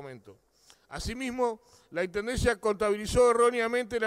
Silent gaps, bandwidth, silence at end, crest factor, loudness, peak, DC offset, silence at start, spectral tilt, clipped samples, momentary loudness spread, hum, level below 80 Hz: none; 14.5 kHz; 0 s; 16 dB; -28 LUFS; -14 dBFS; under 0.1%; 0 s; -4.5 dB/octave; under 0.1%; 16 LU; none; -46 dBFS